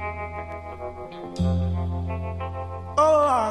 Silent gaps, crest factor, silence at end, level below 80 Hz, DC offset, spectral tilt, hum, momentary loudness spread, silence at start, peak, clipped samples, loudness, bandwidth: none; 16 dB; 0 s; -34 dBFS; under 0.1%; -7 dB/octave; none; 17 LU; 0 s; -8 dBFS; under 0.1%; -25 LUFS; 10.5 kHz